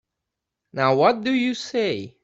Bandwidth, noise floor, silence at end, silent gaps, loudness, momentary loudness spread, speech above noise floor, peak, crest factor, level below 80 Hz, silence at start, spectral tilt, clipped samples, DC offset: 8 kHz; -83 dBFS; 0.15 s; none; -21 LUFS; 7 LU; 62 dB; -4 dBFS; 20 dB; -66 dBFS; 0.75 s; -5.5 dB/octave; under 0.1%; under 0.1%